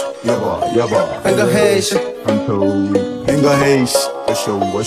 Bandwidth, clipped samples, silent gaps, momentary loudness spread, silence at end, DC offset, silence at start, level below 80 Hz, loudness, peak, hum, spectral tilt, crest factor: 16 kHz; under 0.1%; none; 6 LU; 0 s; under 0.1%; 0 s; -46 dBFS; -15 LUFS; 0 dBFS; none; -5 dB/octave; 14 dB